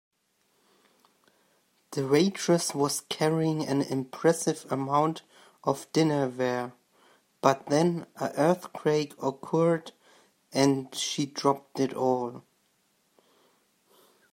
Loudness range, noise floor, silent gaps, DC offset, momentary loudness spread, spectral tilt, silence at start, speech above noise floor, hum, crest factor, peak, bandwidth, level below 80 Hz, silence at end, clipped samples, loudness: 3 LU; -71 dBFS; none; under 0.1%; 9 LU; -5 dB/octave; 1.9 s; 45 dB; none; 22 dB; -6 dBFS; 16 kHz; -76 dBFS; 1.9 s; under 0.1%; -28 LUFS